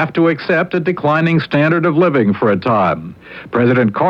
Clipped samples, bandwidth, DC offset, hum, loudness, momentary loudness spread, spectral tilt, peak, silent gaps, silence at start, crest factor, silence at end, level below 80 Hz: under 0.1%; 6.4 kHz; under 0.1%; none; -14 LUFS; 6 LU; -9 dB/octave; -2 dBFS; none; 0 s; 12 dB; 0 s; -54 dBFS